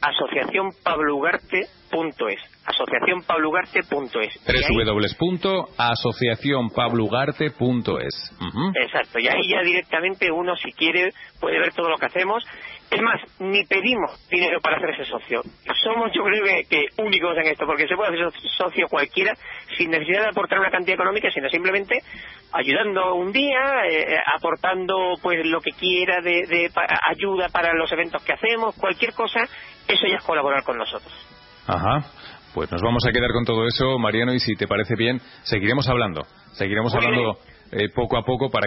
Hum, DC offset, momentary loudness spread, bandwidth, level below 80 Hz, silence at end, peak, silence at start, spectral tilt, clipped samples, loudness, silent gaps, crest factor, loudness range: none; under 0.1%; 8 LU; 5.8 kHz; -46 dBFS; 0 s; -6 dBFS; 0 s; -9 dB/octave; under 0.1%; -21 LUFS; none; 16 dB; 2 LU